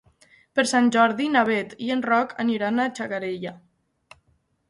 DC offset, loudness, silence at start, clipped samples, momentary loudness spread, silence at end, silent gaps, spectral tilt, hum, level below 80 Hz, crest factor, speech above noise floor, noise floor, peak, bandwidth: under 0.1%; -23 LUFS; 0.55 s; under 0.1%; 10 LU; 1.1 s; none; -4 dB/octave; none; -68 dBFS; 18 dB; 45 dB; -67 dBFS; -6 dBFS; 11.5 kHz